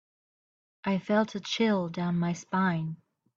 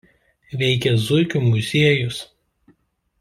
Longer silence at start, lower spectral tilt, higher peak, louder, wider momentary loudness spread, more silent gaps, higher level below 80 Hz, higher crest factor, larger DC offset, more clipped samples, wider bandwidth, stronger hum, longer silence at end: first, 0.85 s vs 0.5 s; about the same, -6 dB/octave vs -6 dB/octave; second, -14 dBFS vs -2 dBFS; second, -29 LUFS vs -19 LUFS; about the same, 9 LU vs 11 LU; neither; second, -70 dBFS vs -54 dBFS; about the same, 16 dB vs 18 dB; neither; neither; second, 7.4 kHz vs 13.5 kHz; neither; second, 0.4 s vs 0.95 s